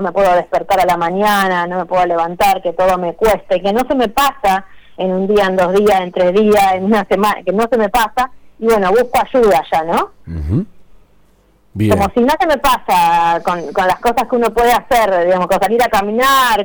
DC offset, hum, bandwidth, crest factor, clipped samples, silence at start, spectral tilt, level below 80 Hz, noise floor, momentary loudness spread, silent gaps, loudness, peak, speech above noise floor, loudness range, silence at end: under 0.1%; none; over 20 kHz; 14 dB; under 0.1%; 0 s; -5 dB/octave; -36 dBFS; -51 dBFS; 6 LU; none; -14 LUFS; 0 dBFS; 38 dB; 3 LU; 0 s